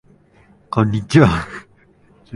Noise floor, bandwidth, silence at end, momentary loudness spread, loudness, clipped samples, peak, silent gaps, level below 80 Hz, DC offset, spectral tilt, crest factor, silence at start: -52 dBFS; 11.5 kHz; 0 s; 18 LU; -16 LUFS; under 0.1%; 0 dBFS; none; -38 dBFS; under 0.1%; -7 dB/octave; 18 dB; 0.7 s